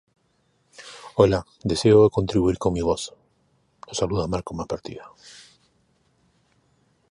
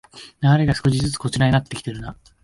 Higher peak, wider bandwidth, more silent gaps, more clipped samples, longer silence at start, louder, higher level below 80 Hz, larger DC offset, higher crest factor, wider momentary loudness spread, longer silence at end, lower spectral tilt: about the same, -2 dBFS vs -4 dBFS; about the same, 11.5 kHz vs 11.5 kHz; neither; neither; first, 0.8 s vs 0.15 s; about the same, -22 LUFS vs -20 LUFS; about the same, -44 dBFS vs -42 dBFS; neither; first, 22 dB vs 16 dB; first, 25 LU vs 15 LU; first, 2.05 s vs 0.3 s; about the same, -6 dB/octave vs -6 dB/octave